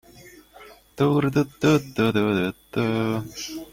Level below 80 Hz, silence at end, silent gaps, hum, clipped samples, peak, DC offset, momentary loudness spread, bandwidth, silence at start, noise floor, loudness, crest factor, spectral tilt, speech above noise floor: -54 dBFS; 0.05 s; none; none; under 0.1%; -6 dBFS; under 0.1%; 8 LU; 16.5 kHz; 0.2 s; -48 dBFS; -23 LUFS; 18 dB; -6.5 dB/octave; 26 dB